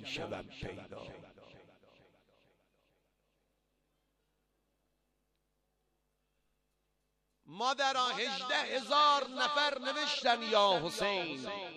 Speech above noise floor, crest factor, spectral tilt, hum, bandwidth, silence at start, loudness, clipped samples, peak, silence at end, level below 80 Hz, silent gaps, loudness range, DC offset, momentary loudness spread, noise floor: 47 dB; 22 dB; -2.5 dB/octave; 50 Hz at -85 dBFS; 12 kHz; 0 s; -32 LUFS; under 0.1%; -14 dBFS; 0 s; -70 dBFS; none; 18 LU; under 0.1%; 17 LU; -81 dBFS